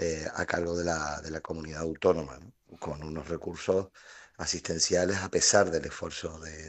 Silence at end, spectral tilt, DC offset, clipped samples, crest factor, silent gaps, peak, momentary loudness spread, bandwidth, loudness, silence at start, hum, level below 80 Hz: 0 s; -3 dB/octave; under 0.1%; under 0.1%; 24 dB; none; -8 dBFS; 15 LU; 8.8 kHz; -30 LUFS; 0 s; none; -56 dBFS